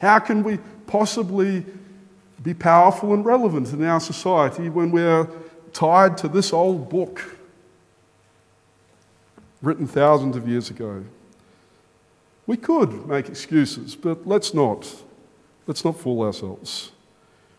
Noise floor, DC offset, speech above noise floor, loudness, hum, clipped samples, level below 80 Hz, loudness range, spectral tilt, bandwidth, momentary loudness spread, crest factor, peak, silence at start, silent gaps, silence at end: -59 dBFS; under 0.1%; 39 dB; -21 LUFS; none; under 0.1%; -66 dBFS; 7 LU; -6 dB/octave; 11 kHz; 16 LU; 22 dB; 0 dBFS; 0 s; none; 0.7 s